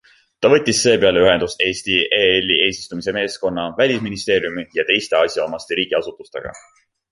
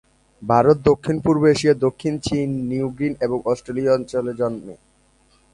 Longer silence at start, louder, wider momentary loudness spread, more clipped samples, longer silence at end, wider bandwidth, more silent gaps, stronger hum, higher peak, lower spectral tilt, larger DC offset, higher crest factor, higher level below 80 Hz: about the same, 0.4 s vs 0.4 s; first, -17 LUFS vs -20 LUFS; about the same, 10 LU vs 9 LU; neither; second, 0.55 s vs 0.8 s; about the same, 11.5 kHz vs 11 kHz; neither; neither; about the same, -2 dBFS vs -2 dBFS; second, -3 dB/octave vs -6.5 dB/octave; neither; about the same, 18 dB vs 18 dB; about the same, -50 dBFS vs -48 dBFS